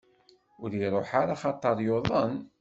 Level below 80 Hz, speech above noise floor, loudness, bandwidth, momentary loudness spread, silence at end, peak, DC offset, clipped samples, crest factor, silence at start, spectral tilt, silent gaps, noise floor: -58 dBFS; 35 dB; -28 LUFS; 8 kHz; 6 LU; 0.15 s; -8 dBFS; under 0.1%; under 0.1%; 20 dB; 0.6 s; -7.5 dB/octave; none; -63 dBFS